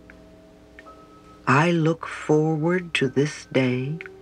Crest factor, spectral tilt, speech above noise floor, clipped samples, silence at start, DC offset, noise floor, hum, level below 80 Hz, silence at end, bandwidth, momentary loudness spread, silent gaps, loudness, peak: 18 dB; -6.5 dB/octave; 27 dB; under 0.1%; 0.8 s; under 0.1%; -49 dBFS; none; -58 dBFS; 0 s; 10.5 kHz; 9 LU; none; -23 LUFS; -6 dBFS